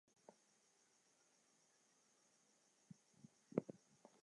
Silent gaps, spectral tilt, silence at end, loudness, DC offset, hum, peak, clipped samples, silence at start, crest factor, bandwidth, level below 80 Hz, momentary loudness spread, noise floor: none; -7 dB/octave; 0.5 s; -49 LUFS; under 0.1%; none; -22 dBFS; under 0.1%; 0.3 s; 34 dB; 11 kHz; under -90 dBFS; 21 LU; -78 dBFS